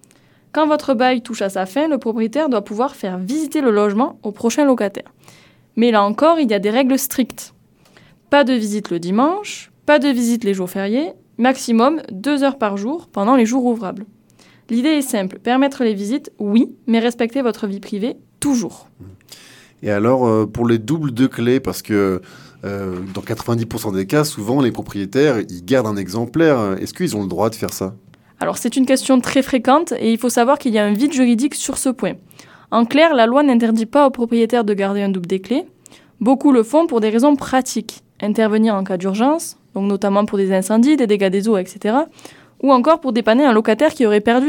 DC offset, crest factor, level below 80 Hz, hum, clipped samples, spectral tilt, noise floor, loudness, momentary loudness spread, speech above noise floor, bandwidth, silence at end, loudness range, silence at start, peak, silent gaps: under 0.1%; 16 dB; -56 dBFS; none; under 0.1%; -5.5 dB/octave; -52 dBFS; -17 LUFS; 10 LU; 36 dB; 18 kHz; 0 s; 4 LU; 0.55 s; 0 dBFS; none